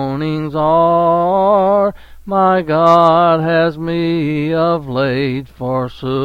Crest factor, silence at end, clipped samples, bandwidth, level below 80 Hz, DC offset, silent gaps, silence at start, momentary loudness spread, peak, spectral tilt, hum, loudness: 14 dB; 0 s; under 0.1%; 7.6 kHz; -44 dBFS; under 0.1%; none; 0 s; 10 LU; 0 dBFS; -8 dB/octave; none; -14 LUFS